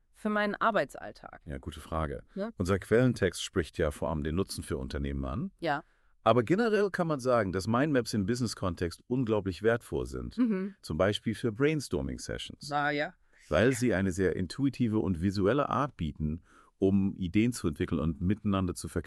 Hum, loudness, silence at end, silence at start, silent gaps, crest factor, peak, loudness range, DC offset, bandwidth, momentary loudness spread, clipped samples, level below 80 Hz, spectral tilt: none; -31 LUFS; 0.05 s; 0.25 s; none; 22 dB; -8 dBFS; 3 LU; under 0.1%; 13.5 kHz; 10 LU; under 0.1%; -48 dBFS; -6 dB/octave